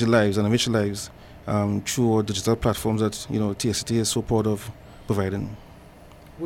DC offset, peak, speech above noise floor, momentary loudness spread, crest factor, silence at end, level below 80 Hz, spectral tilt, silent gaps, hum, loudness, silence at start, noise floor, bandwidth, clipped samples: under 0.1%; -8 dBFS; 23 dB; 14 LU; 16 dB; 0 s; -46 dBFS; -5 dB/octave; none; none; -24 LUFS; 0 s; -46 dBFS; 17 kHz; under 0.1%